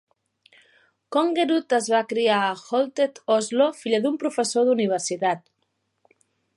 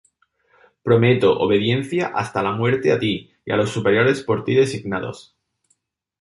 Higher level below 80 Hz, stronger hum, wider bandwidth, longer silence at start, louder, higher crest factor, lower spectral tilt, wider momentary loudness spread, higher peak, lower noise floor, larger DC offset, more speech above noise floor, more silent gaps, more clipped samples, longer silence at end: second, -80 dBFS vs -54 dBFS; neither; about the same, 11.5 kHz vs 11.5 kHz; first, 1.1 s vs 0.85 s; second, -23 LUFS vs -19 LUFS; about the same, 16 dB vs 18 dB; second, -3.5 dB/octave vs -6.5 dB/octave; second, 5 LU vs 10 LU; second, -8 dBFS vs -2 dBFS; first, -74 dBFS vs -68 dBFS; neither; about the same, 52 dB vs 49 dB; neither; neither; first, 1.2 s vs 1 s